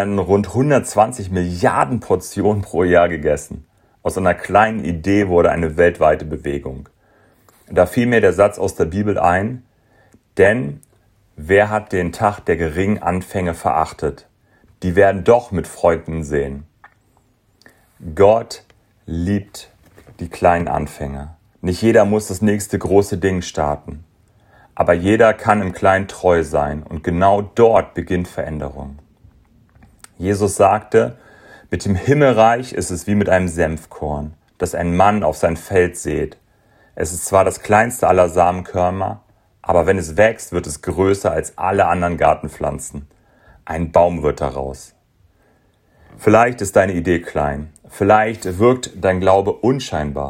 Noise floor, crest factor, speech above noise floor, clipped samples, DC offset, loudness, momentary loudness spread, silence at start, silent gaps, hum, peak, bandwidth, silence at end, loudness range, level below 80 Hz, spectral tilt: -58 dBFS; 18 dB; 41 dB; under 0.1%; under 0.1%; -17 LUFS; 14 LU; 0 s; none; none; 0 dBFS; 16 kHz; 0 s; 4 LU; -42 dBFS; -6 dB/octave